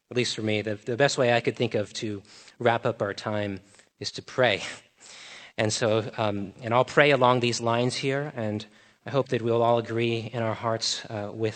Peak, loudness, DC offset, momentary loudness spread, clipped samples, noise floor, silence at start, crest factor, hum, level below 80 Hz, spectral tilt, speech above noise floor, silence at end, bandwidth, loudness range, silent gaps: -2 dBFS; -26 LUFS; under 0.1%; 14 LU; under 0.1%; -47 dBFS; 0.1 s; 24 dB; none; -70 dBFS; -4.5 dB/octave; 21 dB; 0 s; 9 kHz; 5 LU; none